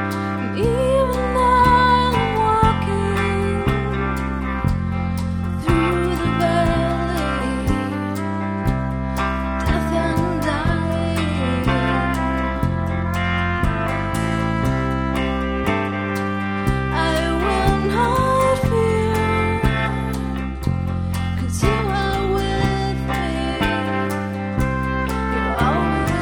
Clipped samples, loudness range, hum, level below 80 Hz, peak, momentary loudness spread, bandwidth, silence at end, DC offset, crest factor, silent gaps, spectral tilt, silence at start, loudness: under 0.1%; 4 LU; none; -28 dBFS; -2 dBFS; 6 LU; 19.5 kHz; 0 s; under 0.1%; 18 dB; none; -6.5 dB/octave; 0 s; -20 LUFS